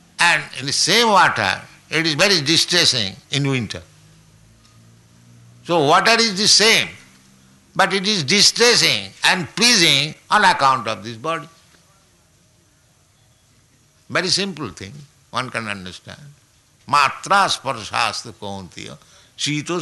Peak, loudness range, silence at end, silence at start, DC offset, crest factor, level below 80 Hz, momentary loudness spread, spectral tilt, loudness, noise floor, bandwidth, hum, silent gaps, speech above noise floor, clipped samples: -2 dBFS; 11 LU; 0 s; 0.2 s; under 0.1%; 18 dB; -58 dBFS; 18 LU; -2 dB/octave; -16 LUFS; -56 dBFS; 12.5 kHz; none; none; 38 dB; under 0.1%